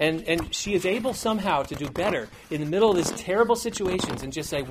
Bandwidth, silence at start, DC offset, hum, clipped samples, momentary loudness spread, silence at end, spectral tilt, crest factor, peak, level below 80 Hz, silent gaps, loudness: 15.5 kHz; 0 s; under 0.1%; none; under 0.1%; 9 LU; 0 s; -4 dB/octave; 18 dB; -8 dBFS; -48 dBFS; none; -25 LUFS